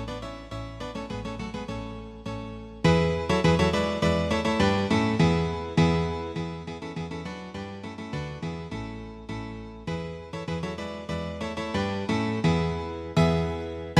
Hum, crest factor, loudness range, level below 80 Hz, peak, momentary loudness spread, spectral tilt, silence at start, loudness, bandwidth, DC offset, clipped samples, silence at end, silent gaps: none; 20 dB; 12 LU; -42 dBFS; -6 dBFS; 14 LU; -6.5 dB/octave; 0 s; -28 LUFS; 10.5 kHz; under 0.1%; under 0.1%; 0 s; none